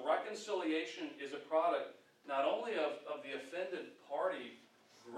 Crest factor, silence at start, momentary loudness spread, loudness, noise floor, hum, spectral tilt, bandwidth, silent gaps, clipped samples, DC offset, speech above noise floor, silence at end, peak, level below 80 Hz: 18 dB; 0 s; 11 LU; -39 LUFS; -63 dBFS; none; -3.5 dB/octave; 12 kHz; none; under 0.1%; under 0.1%; 24 dB; 0 s; -22 dBFS; under -90 dBFS